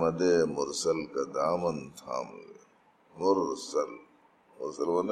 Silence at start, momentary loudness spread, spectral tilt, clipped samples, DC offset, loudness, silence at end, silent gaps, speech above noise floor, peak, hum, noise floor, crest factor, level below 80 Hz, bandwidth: 0 s; 14 LU; -4.5 dB/octave; under 0.1%; under 0.1%; -31 LUFS; 0 s; none; 33 dB; -12 dBFS; none; -63 dBFS; 18 dB; -68 dBFS; 13.5 kHz